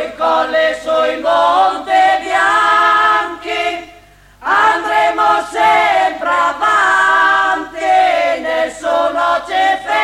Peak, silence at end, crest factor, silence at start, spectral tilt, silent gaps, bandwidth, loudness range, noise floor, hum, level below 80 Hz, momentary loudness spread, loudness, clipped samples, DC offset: -2 dBFS; 0 s; 12 dB; 0 s; -2 dB/octave; none; 14.5 kHz; 2 LU; -43 dBFS; none; -50 dBFS; 7 LU; -13 LUFS; under 0.1%; under 0.1%